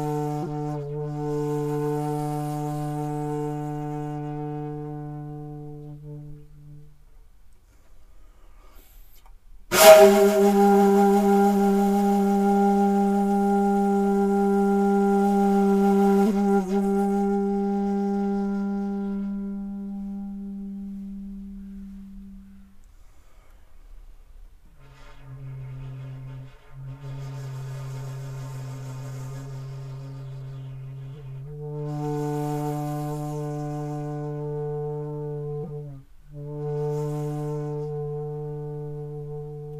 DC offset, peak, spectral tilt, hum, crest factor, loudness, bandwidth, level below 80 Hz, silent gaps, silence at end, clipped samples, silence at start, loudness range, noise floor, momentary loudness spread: under 0.1%; 0 dBFS; -6 dB/octave; none; 24 dB; -23 LUFS; 15.5 kHz; -50 dBFS; none; 0 s; under 0.1%; 0 s; 22 LU; -49 dBFS; 19 LU